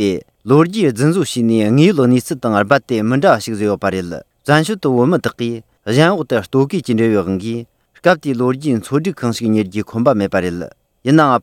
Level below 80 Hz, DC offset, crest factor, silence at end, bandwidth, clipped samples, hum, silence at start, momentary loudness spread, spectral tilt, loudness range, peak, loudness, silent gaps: -54 dBFS; under 0.1%; 14 dB; 0 s; 16.5 kHz; under 0.1%; none; 0 s; 11 LU; -6.5 dB/octave; 3 LU; 0 dBFS; -15 LUFS; none